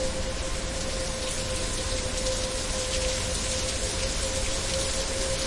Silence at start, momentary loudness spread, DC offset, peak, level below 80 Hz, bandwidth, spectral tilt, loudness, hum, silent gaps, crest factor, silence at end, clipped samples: 0 s; 4 LU; under 0.1%; -12 dBFS; -34 dBFS; 11.5 kHz; -2.5 dB/octave; -28 LUFS; none; none; 16 dB; 0 s; under 0.1%